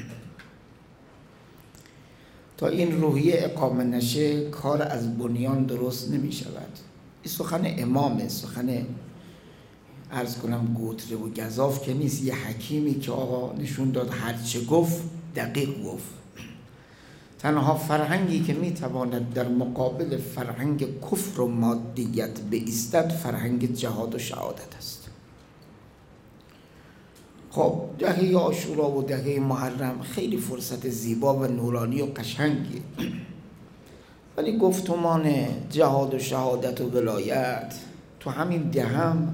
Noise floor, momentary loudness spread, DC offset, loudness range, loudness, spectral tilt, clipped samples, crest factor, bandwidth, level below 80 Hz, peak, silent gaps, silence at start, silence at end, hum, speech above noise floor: -52 dBFS; 13 LU; under 0.1%; 5 LU; -27 LUFS; -6 dB/octave; under 0.1%; 20 dB; 16.5 kHz; -60 dBFS; -6 dBFS; none; 0 s; 0 s; none; 26 dB